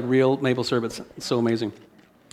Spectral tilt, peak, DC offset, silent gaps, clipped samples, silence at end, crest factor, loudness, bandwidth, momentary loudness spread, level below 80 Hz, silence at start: -6 dB/octave; -8 dBFS; under 0.1%; none; under 0.1%; 0.55 s; 16 dB; -24 LUFS; 14 kHz; 12 LU; -64 dBFS; 0 s